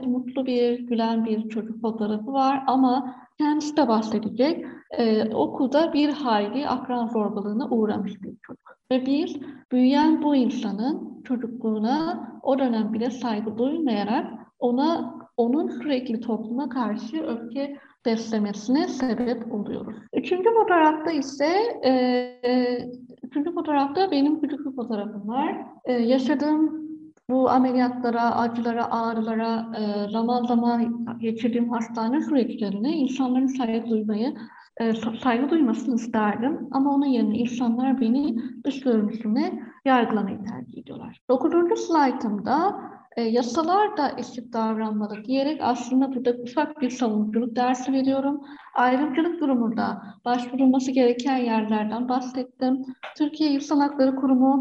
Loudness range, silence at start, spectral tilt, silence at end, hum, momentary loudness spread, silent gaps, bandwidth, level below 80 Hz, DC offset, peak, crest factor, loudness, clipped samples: 3 LU; 0 s; -6 dB/octave; 0 s; none; 9 LU; 9.65-9.69 s, 41.21-41.28 s; 7.6 kHz; -68 dBFS; under 0.1%; -8 dBFS; 16 dB; -24 LUFS; under 0.1%